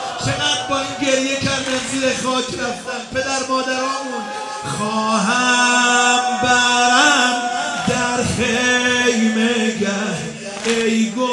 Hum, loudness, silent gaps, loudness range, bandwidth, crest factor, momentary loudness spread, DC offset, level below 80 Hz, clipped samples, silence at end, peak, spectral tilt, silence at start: none; -17 LUFS; none; 6 LU; 11.5 kHz; 18 dB; 11 LU; under 0.1%; -52 dBFS; under 0.1%; 0 s; 0 dBFS; -2.5 dB/octave; 0 s